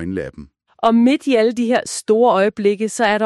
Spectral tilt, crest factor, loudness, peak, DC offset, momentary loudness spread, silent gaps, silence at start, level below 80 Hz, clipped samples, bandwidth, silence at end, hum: -4.5 dB/octave; 14 dB; -16 LUFS; -2 dBFS; under 0.1%; 8 LU; none; 0 s; -52 dBFS; under 0.1%; 12.5 kHz; 0 s; none